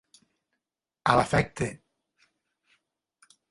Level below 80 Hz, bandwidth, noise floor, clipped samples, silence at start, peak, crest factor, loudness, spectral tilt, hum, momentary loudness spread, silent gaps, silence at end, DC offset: -52 dBFS; 11.5 kHz; -87 dBFS; under 0.1%; 1.05 s; -4 dBFS; 28 dB; -26 LUFS; -5.5 dB/octave; none; 11 LU; none; 1.75 s; under 0.1%